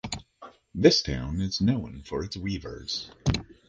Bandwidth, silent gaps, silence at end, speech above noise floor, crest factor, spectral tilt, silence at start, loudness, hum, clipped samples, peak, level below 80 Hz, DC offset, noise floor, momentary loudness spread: 10 kHz; none; 0.25 s; 24 dB; 24 dB; -5 dB/octave; 0.05 s; -27 LUFS; none; under 0.1%; -4 dBFS; -42 dBFS; under 0.1%; -51 dBFS; 14 LU